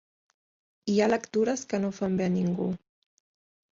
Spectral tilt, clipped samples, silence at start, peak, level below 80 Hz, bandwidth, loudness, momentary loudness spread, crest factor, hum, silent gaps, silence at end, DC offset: -6 dB/octave; under 0.1%; 0.85 s; -12 dBFS; -66 dBFS; 7.6 kHz; -28 LUFS; 8 LU; 18 dB; none; none; 1 s; under 0.1%